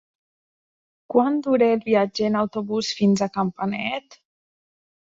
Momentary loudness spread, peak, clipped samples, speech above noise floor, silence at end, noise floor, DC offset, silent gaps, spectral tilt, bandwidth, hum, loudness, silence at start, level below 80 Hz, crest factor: 7 LU; -4 dBFS; under 0.1%; over 69 dB; 0.9 s; under -90 dBFS; under 0.1%; none; -6 dB/octave; 7.8 kHz; none; -22 LUFS; 1.1 s; -66 dBFS; 18 dB